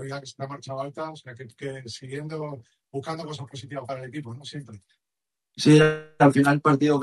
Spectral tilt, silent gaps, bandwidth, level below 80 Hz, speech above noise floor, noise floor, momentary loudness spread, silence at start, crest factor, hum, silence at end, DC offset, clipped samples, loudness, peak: -6.5 dB/octave; none; 12 kHz; -64 dBFS; 64 dB; -88 dBFS; 20 LU; 0 s; 20 dB; none; 0 s; under 0.1%; under 0.1%; -23 LUFS; -4 dBFS